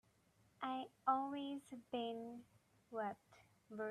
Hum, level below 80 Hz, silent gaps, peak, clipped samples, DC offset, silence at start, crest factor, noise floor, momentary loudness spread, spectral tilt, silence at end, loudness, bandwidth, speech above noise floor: none; -86 dBFS; none; -24 dBFS; under 0.1%; under 0.1%; 0.6 s; 22 dB; -75 dBFS; 15 LU; -5.5 dB/octave; 0 s; -45 LUFS; 13.5 kHz; 27 dB